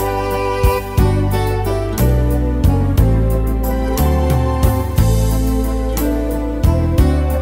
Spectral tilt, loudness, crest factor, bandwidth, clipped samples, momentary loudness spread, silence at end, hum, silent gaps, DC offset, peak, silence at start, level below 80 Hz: -7 dB/octave; -16 LUFS; 14 dB; 16.5 kHz; under 0.1%; 4 LU; 0 s; none; none; under 0.1%; 0 dBFS; 0 s; -18 dBFS